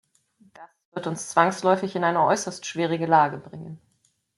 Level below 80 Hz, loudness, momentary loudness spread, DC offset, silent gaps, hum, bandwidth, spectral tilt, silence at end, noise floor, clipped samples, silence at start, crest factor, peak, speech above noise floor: -72 dBFS; -23 LUFS; 18 LU; under 0.1%; 0.85-0.92 s; none; 12 kHz; -4.5 dB/octave; 0.6 s; -68 dBFS; under 0.1%; 0.6 s; 22 dB; -4 dBFS; 45 dB